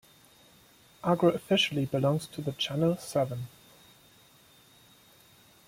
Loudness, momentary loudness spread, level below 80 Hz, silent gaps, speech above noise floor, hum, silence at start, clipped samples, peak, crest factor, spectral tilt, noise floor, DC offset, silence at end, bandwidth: -29 LUFS; 10 LU; -66 dBFS; none; 31 dB; none; 1.05 s; under 0.1%; -12 dBFS; 20 dB; -5.5 dB/octave; -59 dBFS; under 0.1%; 2.2 s; 16.5 kHz